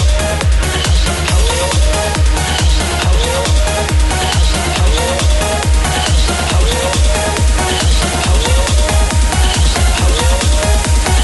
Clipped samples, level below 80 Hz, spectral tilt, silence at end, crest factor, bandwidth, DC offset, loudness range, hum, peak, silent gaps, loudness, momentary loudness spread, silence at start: under 0.1%; -14 dBFS; -4 dB/octave; 0 s; 10 dB; 12 kHz; under 0.1%; 1 LU; none; 0 dBFS; none; -13 LUFS; 1 LU; 0 s